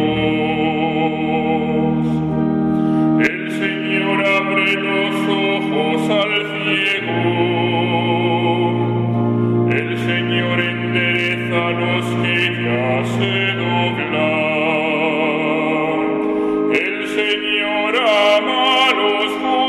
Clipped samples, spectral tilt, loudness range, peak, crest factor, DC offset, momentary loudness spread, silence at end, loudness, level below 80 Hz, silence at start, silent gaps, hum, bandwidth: under 0.1%; -6 dB/octave; 1 LU; -2 dBFS; 14 dB; under 0.1%; 4 LU; 0 s; -17 LUFS; -50 dBFS; 0 s; none; none; 13 kHz